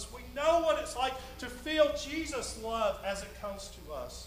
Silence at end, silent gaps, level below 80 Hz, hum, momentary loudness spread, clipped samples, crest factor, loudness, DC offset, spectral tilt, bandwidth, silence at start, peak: 0 s; none; -50 dBFS; 60 Hz at -50 dBFS; 14 LU; under 0.1%; 20 dB; -33 LUFS; under 0.1%; -3 dB/octave; 15.5 kHz; 0 s; -12 dBFS